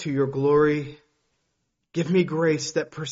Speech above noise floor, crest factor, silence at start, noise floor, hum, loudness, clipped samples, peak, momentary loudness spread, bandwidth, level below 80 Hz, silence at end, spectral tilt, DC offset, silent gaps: 53 dB; 16 dB; 0 s; -76 dBFS; none; -23 LUFS; under 0.1%; -8 dBFS; 10 LU; 7.8 kHz; -60 dBFS; 0 s; -6 dB/octave; under 0.1%; none